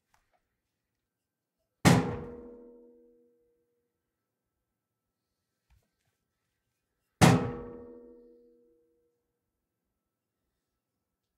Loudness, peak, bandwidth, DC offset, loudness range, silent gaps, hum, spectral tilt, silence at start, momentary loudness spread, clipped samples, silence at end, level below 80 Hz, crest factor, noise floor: -26 LUFS; -6 dBFS; 15.5 kHz; under 0.1%; 3 LU; none; none; -5.5 dB/octave; 1.85 s; 24 LU; under 0.1%; 3.55 s; -58 dBFS; 28 dB; -88 dBFS